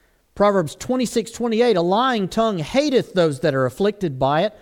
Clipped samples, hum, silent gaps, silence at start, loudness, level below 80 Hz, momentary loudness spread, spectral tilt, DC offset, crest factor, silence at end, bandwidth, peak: under 0.1%; none; none; 0.35 s; -20 LUFS; -50 dBFS; 5 LU; -5.5 dB/octave; under 0.1%; 14 dB; 0.1 s; 17 kHz; -4 dBFS